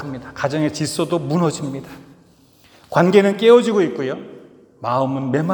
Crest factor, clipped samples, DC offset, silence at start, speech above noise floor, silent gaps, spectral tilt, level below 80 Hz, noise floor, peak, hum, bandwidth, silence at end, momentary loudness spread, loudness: 18 dB; under 0.1%; under 0.1%; 0 s; 34 dB; none; -6 dB/octave; -58 dBFS; -51 dBFS; 0 dBFS; none; over 20 kHz; 0 s; 16 LU; -18 LUFS